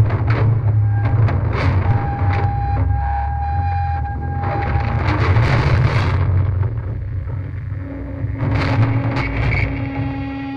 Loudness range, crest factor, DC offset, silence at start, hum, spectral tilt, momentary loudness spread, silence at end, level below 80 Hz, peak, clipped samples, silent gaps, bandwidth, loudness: 3 LU; 14 dB; under 0.1%; 0 s; none; -8.5 dB/octave; 9 LU; 0 s; -26 dBFS; -4 dBFS; under 0.1%; none; 6.4 kHz; -19 LUFS